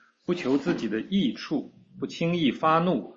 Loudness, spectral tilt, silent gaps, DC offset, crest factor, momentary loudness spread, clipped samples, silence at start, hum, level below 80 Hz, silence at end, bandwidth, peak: -26 LUFS; -6.5 dB/octave; none; under 0.1%; 18 dB; 11 LU; under 0.1%; 0.3 s; none; -64 dBFS; 0.05 s; 7.6 kHz; -8 dBFS